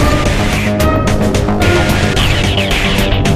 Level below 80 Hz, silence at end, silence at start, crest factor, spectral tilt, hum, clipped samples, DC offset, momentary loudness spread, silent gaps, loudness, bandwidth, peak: -18 dBFS; 0 s; 0 s; 12 dB; -5 dB/octave; none; under 0.1%; under 0.1%; 2 LU; none; -12 LUFS; 15.5 kHz; 0 dBFS